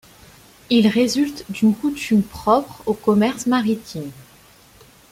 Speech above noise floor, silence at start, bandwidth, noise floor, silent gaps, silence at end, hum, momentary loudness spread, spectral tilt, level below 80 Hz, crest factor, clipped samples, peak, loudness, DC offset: 31 dB; 0.7 s; 16 kHz; -49 dBFS; none; 0.9 s; none; 9 LU; -5.5 dB/octave; -52 dBFS; 16 dB; under 0.1%; -4 dBFS; -19 LUFS; under 0.1%